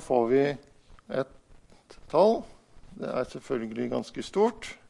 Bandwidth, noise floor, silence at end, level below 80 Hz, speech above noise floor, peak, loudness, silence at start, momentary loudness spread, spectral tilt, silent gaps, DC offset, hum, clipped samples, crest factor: 11.5 kHz; -55 dBFS; 0.15 s; -56 dBFS; 28 dB; -8 dBFS; -28 LUFS; 0 s; 11 LU; -6 dB/octave; none; under 0.1%; none; under 0.1%; 20 dB